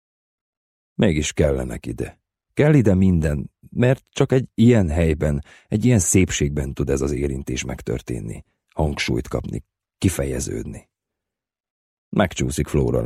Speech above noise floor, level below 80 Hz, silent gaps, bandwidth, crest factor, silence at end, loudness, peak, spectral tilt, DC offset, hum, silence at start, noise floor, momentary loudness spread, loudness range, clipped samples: 67 dB; -34 dBFS; 11.60-11.64 s, 11.70-12.11 s; 15 kHz; 18 dB; 0 s; -21 LUFS; -4 dBFS; -6 dB/octave; under 0.1%; none; 1 s; -87 dBFS; 15 LU; 8 LU; under 0.1%